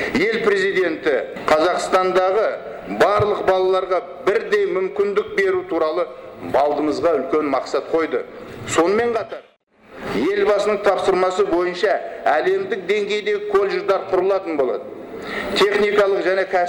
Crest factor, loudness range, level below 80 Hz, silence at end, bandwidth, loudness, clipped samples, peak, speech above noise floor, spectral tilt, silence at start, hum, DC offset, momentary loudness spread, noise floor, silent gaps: 16 dB; 3 LU; -52 dBFS; 0 s; 17 kHz; -19 LUFS; under 0.1%; -4 dBFS; 27 dB; -4.5 dB/octave; 0 s; none; under 0.1%; 9 LU; -46 dBFS; 9.63-9.67 s